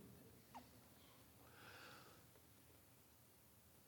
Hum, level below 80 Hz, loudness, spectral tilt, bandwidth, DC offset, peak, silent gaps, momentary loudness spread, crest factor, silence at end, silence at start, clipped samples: none; -82 dBFS; -64 LUFS; -3.5 dB/octave; 19 kHz; under 0.1%; -48 dBFS; none; 8 LU; 18 dB; 0 s; 0 s; under 0.1%